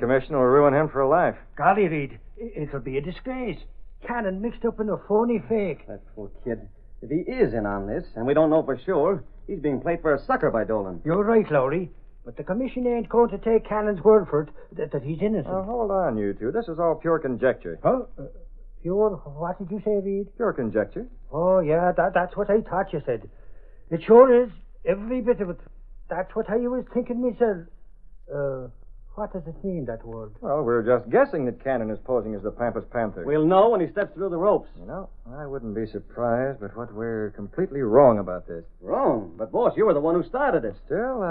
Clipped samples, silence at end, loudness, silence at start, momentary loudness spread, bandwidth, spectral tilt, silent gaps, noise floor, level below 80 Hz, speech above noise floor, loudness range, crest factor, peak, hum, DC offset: under 0.1%; 0 s; -24 LUFS; 0 s; 15 LU; 4.5 kHz; -11.5 dB/octave; none; -43 dBFS; -44 dBFS; 20 dB; 6 LU; 22 dB; -2 dBFS; none; under 0.1%